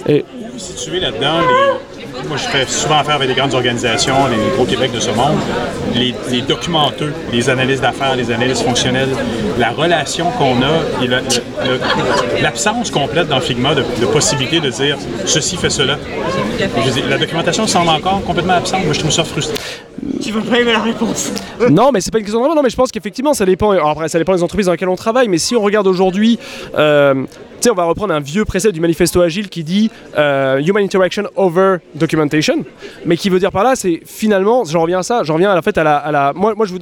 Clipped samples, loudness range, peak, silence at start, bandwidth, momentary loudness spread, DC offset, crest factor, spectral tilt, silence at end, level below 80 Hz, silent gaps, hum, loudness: under 0.1%; 2 LU; -2 dBFS; 0 s; 18 kHz; 6 LU; under 0.1%; 12 dB; -4 dB/octave; 0 s; -40 dBFS; none; none; -14 LUFS